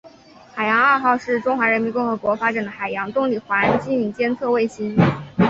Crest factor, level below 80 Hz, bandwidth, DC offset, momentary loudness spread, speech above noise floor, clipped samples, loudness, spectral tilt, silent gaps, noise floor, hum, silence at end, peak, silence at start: 18 dB; -52 dBFS; 7.8 kHz; under 0.1%; 7 LU; 26 dB; under 0.1%; -20 LUFS; -7.5 dB/octave; none; -46 dBFS; none; 0 s; -2 dBFS; 0.05 s